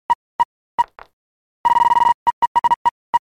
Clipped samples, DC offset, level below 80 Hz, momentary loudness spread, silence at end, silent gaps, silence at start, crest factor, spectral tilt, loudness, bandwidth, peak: under 0.1%; under 0.1%; -52 dBFS; 8 LU; 0.1 s; 0.15-0.39 s, 0.45-0.78 s, 1.13-1.64 s, 2.14-2.26 s, 2.33-2.55 s, 2.76-2.85 s, 2.91-3.13 s; 0.1 s; 12 dB; -2.5 dB/octave; -18 LUFS; 16 kHz; -6 dBFS